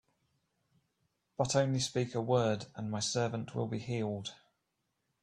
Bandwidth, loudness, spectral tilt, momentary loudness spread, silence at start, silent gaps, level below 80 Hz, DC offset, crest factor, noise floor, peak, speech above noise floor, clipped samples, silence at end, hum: 11 kHz; -34 LUFS; -5 dB/octave; 9 LU; 1.4 s; none; -68 dBFS; under 0.1%; 20 dB; -83 dBFS; -14 dBFS; 49 dB; under 0.1%; 0.85 s; none